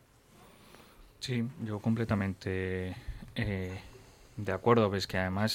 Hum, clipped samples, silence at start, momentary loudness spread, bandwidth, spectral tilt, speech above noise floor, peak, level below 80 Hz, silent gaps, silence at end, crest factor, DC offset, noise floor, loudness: none; under 0.1%; 0.4 s; 15 LU; 16.5 kHz; -6 dB/octave; 28 dB; -12 dBFS; -54 dBFS; none; 0 s; 22 dB; under 0.1%; -59 dBFS; -33 LUFS